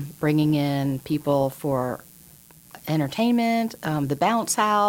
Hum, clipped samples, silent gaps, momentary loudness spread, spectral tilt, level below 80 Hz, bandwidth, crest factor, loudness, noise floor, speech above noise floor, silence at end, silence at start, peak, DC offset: none; under 0.1%; none; 6 LU; -5.5 dB/octave; -58 dBFS; 17 kHz; 16 dB; -23 LUFS; -50 dBFS; 27 dB; 0 s; 0 s; -6 dBFS; under 0.1%